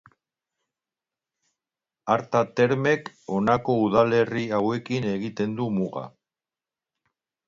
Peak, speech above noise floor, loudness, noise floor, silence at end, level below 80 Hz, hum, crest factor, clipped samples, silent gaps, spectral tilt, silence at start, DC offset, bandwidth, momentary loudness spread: -6 dBFS; over 67 dB; -24 LUFS; under -90 dBFS; 1.4 s; -62 dBFS; none; 20 dB; under 0.1%; none; -7 dB/octave; 2.05 s; under 0.1%; 7.6 kHz; 9 LU